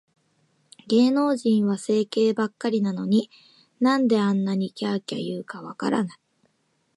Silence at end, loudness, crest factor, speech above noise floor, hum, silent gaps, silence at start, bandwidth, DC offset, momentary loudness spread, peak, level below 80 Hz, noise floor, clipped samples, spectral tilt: 0.85 s; -24 LUFS; 16 dB; 47 dB; none; none; 0.85 s; 11.5 kHz; under 0.1%; 10 LU; -8 dBFS; -74 dBFS; -70 dBFS; under 0.1%; -6.5 dB/octave